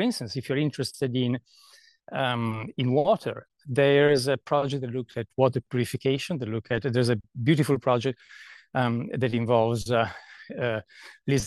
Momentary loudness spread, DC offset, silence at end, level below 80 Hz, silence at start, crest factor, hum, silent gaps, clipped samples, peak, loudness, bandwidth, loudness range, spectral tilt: 11 LU; under 0.1%; 0 s; -58 dBFS; 0 s; 18 dB; none; none; under 0.1%; -8 dBFS; -26 LUFS; 12.5 kHz; 3 LU; -6 dB/octave